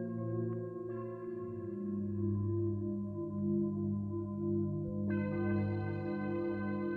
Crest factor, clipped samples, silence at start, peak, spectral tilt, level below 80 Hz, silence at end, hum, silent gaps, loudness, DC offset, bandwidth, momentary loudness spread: 12 dB; under 0.1%; 0 s; -24 dBFS; -11.5 dB/octave; -64 dBFS; 0 s; none; none; -37 LUFS; under 0.1%; 4.3 kHz; 7 LU